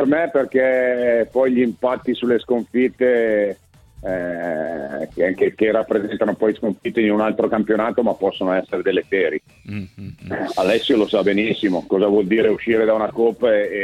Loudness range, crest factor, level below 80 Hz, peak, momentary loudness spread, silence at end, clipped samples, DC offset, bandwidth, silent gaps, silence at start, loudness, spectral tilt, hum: 3 LU; 14 dB; -54 dBFS; -4 dBFS; 10 LU; 0 s; under 0.1%; under 0.1%; 12.5 kHz; none; 0 s; -19 LUFS; -6.5 dB/octave; none